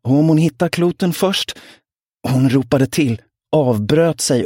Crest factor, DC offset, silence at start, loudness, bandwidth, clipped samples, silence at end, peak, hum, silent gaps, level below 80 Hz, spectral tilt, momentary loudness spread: 14 dB; under 0.1%; 0.05 s; -16 LUFS; 17 kHz; under 0.1%; 0 s; -2 dBFS; none; 2.06-2.10 s; -50 dBFS; -5.5 dB/octave; 8 LU